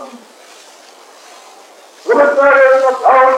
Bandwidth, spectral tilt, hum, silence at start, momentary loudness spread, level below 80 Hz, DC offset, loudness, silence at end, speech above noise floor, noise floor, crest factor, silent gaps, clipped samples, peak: 11 kHz; -2.5 dB/octave; none; 0 s; 7 LU; -64 dBFS; under 0.1%; -9 LUFS; 0 s; 31 dB; -40 dBFS; 12 dB; none; under 0.1%; 0 dBFS